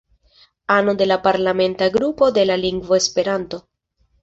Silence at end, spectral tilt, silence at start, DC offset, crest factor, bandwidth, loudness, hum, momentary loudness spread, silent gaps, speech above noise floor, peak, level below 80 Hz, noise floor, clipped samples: 0.65 s; -4 dB/octave; 0.7 s; under 0.1%; 18 dB; 8 kHz; -18 LUFS; none; 8 LU; none; 46 dB; -2 dBFS; -52 dBFS; -63 dBFS; under 0.1%